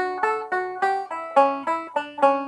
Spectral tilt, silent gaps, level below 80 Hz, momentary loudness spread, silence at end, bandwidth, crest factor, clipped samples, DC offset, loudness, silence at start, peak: -4 dB/octave; none; -74 dBFS; 7 LU; 0 s; 11 kHz; 20 dB; under 0.1%; under 0.1%; -23 LUFS; 0 s; -4 dBFS